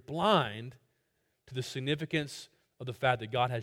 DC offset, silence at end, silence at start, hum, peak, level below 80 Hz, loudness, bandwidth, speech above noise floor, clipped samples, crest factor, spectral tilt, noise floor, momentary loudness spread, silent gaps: under 0.1%; 0 s; 0.1 s; none; -12 dBFS; -68 dBFS; -32 LUFS; 16.5 kHz; 46 dB; under 0.1%; 22 dB; -5.5 dB/octave; -78 dBFS; 17 LU; none